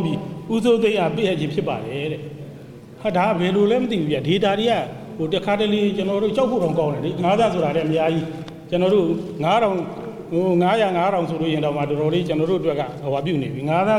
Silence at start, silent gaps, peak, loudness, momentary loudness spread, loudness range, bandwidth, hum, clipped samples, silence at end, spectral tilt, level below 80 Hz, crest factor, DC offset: 0 s; none; -8 dBFS; -21 LUFS; 10 LU; 2 LU; 14 kHz; none; under 0.1%; 0 s; -7 dB/octave; -54 dBFS; 12 dB; under 0.1%